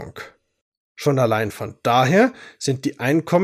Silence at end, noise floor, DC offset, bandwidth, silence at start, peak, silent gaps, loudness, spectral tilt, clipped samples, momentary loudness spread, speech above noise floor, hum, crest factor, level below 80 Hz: 0 s; -41 dBFS; under 0.1%; 15.5 kHz; 0 s; -4 dBFS; 0.61-0.95 s; -20 LUFS; -6 dB/octave; under 0.1%; 15 LU; 22 dB; none; 16 dB; -62 dBFS